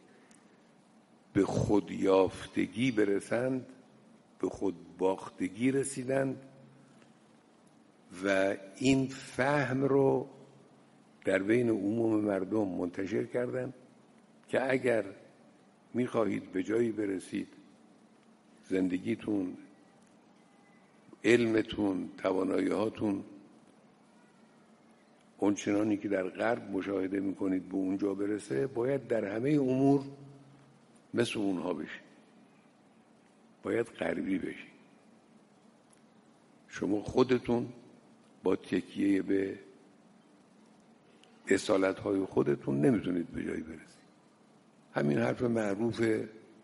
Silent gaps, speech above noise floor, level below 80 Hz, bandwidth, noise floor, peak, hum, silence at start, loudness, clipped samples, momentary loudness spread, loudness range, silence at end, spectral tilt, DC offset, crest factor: none; 32 dB; -66 dBFS; 11.5 kHz; -62 dBFS; -12 dBFS; none; 1.35 s; -32 LUFS; under 0.1%; 11 LU; 7 LU; 0.25 s; -6 dB/octave; under 0.1%; 22 dB